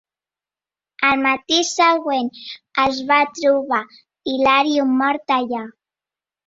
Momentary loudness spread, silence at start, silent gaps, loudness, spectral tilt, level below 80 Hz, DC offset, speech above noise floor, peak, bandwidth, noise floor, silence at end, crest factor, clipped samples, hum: 11 LU; 1 s; none; -18 LUFS; -2 dB/octave; -60 dBFS; under 0.1%; over 72 dB; -2 dBFS; 7.8 kHz; under -90 dBFS; 0.75 s; 18 dB; under 0.1%; none